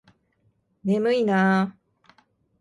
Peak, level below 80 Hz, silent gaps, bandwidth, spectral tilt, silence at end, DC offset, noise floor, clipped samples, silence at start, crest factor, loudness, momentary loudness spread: -10 dBFS; -70 dBFS; none; 11 kHz; -7.5 dB/octave; 0.9 s; under 0.1%; -68 dBFS; under 0.1%; 0.85 s; 16 dB; -23 LUFS; 10 LU